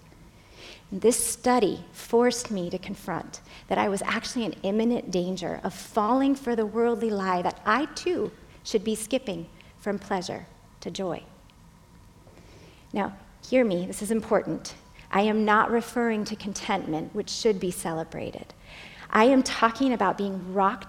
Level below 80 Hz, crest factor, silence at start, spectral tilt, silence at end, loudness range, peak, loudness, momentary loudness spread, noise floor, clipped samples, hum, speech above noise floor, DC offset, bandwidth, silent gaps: -56 dBFS; 22 dB; 0.2 s; -4.5 dB/octave; 0 s; 7 LU; -4 dBFS; -26 LUFS; 15 LU; -53 dBFS; under 0.1%; none; 27 dB; under 0.1%; 17 kHz; none